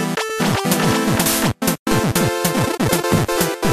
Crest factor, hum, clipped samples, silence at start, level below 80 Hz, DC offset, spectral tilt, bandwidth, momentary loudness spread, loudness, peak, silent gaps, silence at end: 16 dB; none; under 0.1%; 0 s; -40 dBFS; under 0.1%; -4 dB/octave; 15 kHz; 3 LU; -18 LUFS; -2 dBFS; 1.79-1.86 s; 0 s